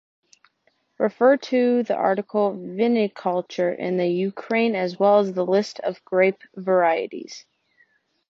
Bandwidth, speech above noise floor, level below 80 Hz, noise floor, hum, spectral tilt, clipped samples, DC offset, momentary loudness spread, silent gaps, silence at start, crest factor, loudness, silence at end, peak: 7.6 kHz; 46 dB; -76 dBFS; -68 dBFS; none; -6.5 dB/octave; under 0.1%; under 0.1%; 9 LU; none; 1 s; 16 dB; -22 LUFS; 0.9 s; -6 dBFS